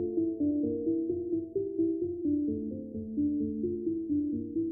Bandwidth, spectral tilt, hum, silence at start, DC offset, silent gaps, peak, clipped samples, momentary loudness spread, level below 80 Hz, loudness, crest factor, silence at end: 0.8 kHz; -10.5 dB/octave; none; 0 s; under 0.1%; none; -20 dBFS; under 0.1%; 4 LU; -60 dBFS; -32 LUFS; 12 dB; 0 s